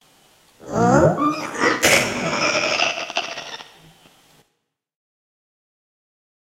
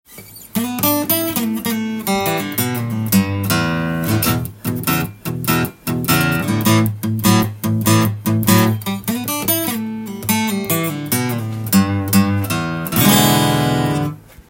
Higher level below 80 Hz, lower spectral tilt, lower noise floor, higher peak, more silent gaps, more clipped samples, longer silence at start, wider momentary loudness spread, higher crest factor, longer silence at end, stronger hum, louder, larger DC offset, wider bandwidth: about the same, -50 dBFS vs -48 dBFS; about the same, -3.5 dB/octave vs -4.5 dB/octave; first, -74 dBFS vs -38 dBFS; about the same, 0 dBFS vs 0 dBFS; neither; neither; first, 0.65 s vs 0.1 s; first, 14 LU vs 8 LU; about the same, 22 dB vs 18 dB; first, 2.9 s vs 0.1 s; neither; about the same, -18 LUFS vs -17 LUFS; neither; about the same, 16 kHz vs 17 kHz